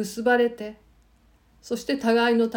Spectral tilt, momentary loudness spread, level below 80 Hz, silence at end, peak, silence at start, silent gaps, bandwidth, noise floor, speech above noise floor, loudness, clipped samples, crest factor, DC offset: -4.5 dB/octave; 16 LU; -60 dBFS; 0 s; -8 dBFS; 0 s; none; 17 kHz; -59 dBFS; 36 dB; -23 LUFS; under 0.1%; 16 dB; under 0.1%